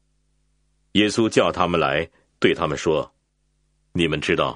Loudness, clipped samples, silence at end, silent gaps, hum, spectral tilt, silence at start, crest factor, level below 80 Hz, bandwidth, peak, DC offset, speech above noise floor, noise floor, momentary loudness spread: -21 LUFS; under 0.1%; 0 s; none; none; -5 dB/octave; 0.95 s; 22 dB; -48 dBFS; 10 kHz; -2 dBFS; under 0.1%; 48 dB; -68 dBFS; 7 LU